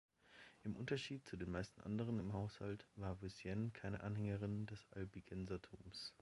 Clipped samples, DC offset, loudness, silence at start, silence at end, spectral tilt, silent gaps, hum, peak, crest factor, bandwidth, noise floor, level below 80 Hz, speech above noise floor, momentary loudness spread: under 0.1%; under 0.1%; -48 LUFS; 0.25 s; 0.1 s; -6.5 dB/octave; none; none; -30 dBFS; 18 dB; 11.5 kHz; -66 dBFS; -64 dBFS; 19 dB; 8 LU